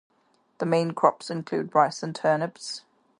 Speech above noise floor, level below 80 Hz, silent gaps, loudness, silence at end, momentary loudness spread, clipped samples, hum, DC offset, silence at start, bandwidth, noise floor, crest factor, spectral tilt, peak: 42 dB; -76 dBFS; none; -26 LUFS; 0.4 s; 13 LU; under 0.1%; none; under 0.1%; 0.6 s; 11.5 kHz; -67 dBFS; 22 dB; -5.5 dB/octave; -4 dBFS